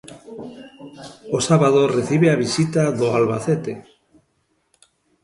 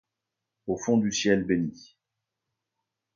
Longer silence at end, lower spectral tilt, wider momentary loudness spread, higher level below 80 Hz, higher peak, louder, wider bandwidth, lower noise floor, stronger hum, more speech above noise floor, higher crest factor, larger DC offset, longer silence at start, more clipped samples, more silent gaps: about the same, 1.45 s vs 1.45 s; first, -6 dB/octave vs -4.5 dB/octave; first, 23 LU vs 11 LU; about the same, -58 dBFS vs -60 dBFS; first, -4 dBFS vs -10 dBFS; first, -18 LUFS vs -26 LUFS; first, 11.5 kHz vs 7.4 kHz; second, -67 dBFS vs -86 dBFS; neither; second, 48 dB vs 60 dB; about the same, 18 dB vs 20 dB; neither; second, 0.1 s vs 0.65 s; neither; neither